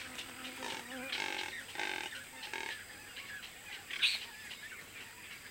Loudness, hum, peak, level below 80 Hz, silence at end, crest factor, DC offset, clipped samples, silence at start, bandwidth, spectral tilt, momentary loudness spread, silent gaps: -40 LUFS; none; -16 dBFS; -72 dBFS; 0 s; 26 dB; under 0.1%; under 0.1%; 0 s; 17 kHz; -0.5 dB/octave; 15 LU; none